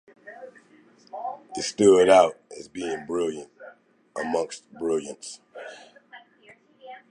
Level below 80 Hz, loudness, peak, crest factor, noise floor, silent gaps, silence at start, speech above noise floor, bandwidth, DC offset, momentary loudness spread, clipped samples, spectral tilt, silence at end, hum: -64 dBFS; -23 LUFS; -4 dBFS; 22 dB; -56 dBFS; none; 0.25 s; 33 dB; 11.5 kHz; under 0.1%; 27 LU; under 0.1%; -4 dB/octave; 0.15 s; none